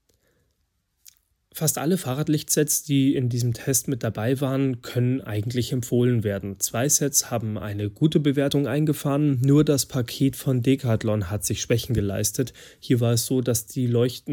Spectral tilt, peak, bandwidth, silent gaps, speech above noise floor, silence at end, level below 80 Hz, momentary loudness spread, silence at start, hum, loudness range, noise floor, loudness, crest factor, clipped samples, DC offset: -5 dB/octave; -6 dBFS; 18 kHz; none; 49 dB; 0 s; -52 dBFS; 6 LU; 1.55 s; none; 2 LU; -72 dBFS; -23 LUFS; 18 dB; under 0.1%; under 0.1%